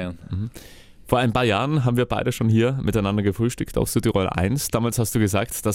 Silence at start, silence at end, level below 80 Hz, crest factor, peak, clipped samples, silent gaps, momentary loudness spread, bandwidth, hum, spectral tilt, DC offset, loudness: 0 s; 0 s; -40 dBFS; 20 dB; -2 dBFS; under 0.1%; none; 5 LU; 17 kHz; none; -5.5 dB/octave; under 0.1%; -22 LUFS